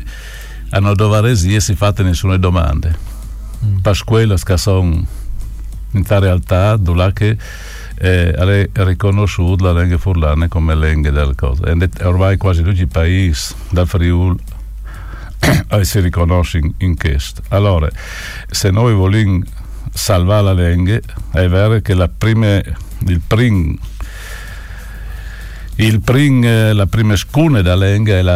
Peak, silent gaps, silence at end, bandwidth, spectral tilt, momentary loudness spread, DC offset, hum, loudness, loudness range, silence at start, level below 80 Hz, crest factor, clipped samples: -2 dBFS; none; 0 s; 15.5 kHz; -6.5 dB/octave; 17 LU; under 0.1%; none; -14 LUFS; 2 LU; 0 s; -22 dBFS; 10 dB; under 0.1%